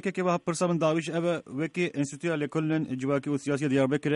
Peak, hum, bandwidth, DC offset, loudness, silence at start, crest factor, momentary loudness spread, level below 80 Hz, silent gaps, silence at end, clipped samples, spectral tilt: -12 dBFS; none; 11.5 kHz; under 0.1%; -28 LUFS; 0.05 s; 14 dB; 5 LU; -70 dBFS; none; 0 s; under 0.1%; -6 dB/octave